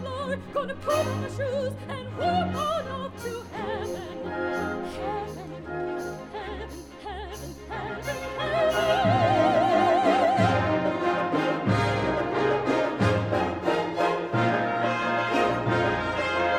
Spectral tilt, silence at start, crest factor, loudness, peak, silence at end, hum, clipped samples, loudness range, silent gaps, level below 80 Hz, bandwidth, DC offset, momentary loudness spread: -6 dB/octave; 0 s; 16 dB; -26 LUFS; -10 dBFS; 0 s; none; under 0.1%; 10 LU; none; -50 dBFS; 19 kHz; under 0.1%; 14 LU